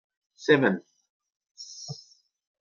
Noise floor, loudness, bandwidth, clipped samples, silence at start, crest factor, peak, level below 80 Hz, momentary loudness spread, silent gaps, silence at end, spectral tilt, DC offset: -57 dBFS; -24 LUFS; 7.4 kHz; under 0.1%; 0.4 s; 24 dB; -6 dBFS; -76 dBFS; 21 LU; 1.10-1.20 s, 1.36-1.40 s, 1.51-1.55 s; 0.65 s; -5.5 dB/octave; under 0.1%